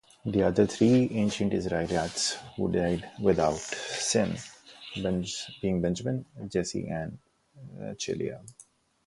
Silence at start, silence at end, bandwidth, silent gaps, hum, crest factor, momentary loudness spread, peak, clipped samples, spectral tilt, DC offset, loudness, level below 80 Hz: 0.25 s; 0.55 s; 11.5 kHz; none; none; 20 dB; 15 LU; -10 dBFS; under 0.1%; -5 dB/octave; under 0.1%; -29 LUFS; -52 dBFS